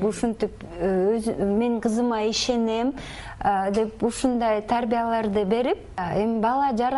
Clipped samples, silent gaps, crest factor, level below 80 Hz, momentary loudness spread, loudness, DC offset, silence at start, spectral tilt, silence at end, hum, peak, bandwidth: under 0.1%; none; 16 dB; -46 dBFS; 6 LU; -24 LUFS; under 0.1%; 0 s; -5 dB/octave; 0 s; none; -8 dBFS; 11.5 kHz